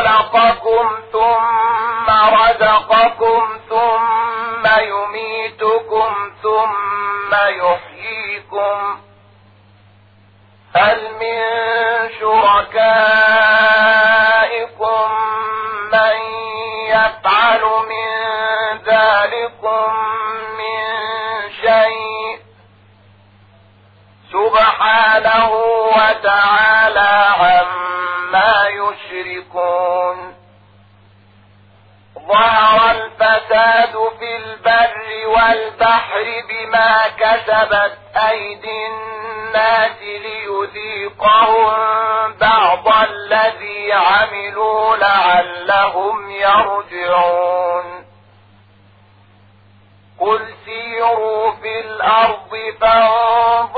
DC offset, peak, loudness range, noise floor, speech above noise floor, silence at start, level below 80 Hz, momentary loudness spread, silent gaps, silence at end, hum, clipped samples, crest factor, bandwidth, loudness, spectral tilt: under 0.1%; 0 dBFS; 8 LU; -48 dBFS; 34 dB; 0 s; -48 dBFS; 12 LU; none; 0 s; none; under 0.1%; 14 dB; 4.9 kHz; -14 LUFS; -5 dB/octave